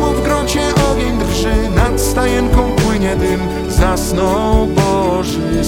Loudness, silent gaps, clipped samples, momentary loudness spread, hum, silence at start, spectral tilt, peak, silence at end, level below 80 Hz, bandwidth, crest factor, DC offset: -14 LUFS; none; under 0.1%; 3 LU; none; 0 s; -5.5 dB/octave; 0 dBFS; 0 s; -20 dBFS; 18.5 kHz; 12 dB; under 0.1%